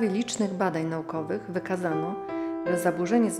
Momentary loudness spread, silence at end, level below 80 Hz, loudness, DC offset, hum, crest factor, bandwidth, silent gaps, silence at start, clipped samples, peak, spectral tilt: 7 LU; 0 s; -68 dBFS; -28 LUFS; under 0.1%; none; 16 dB; 15 kHz; none; 0 s; under 0.1%; -12 dBFS; -5.5 dB/octave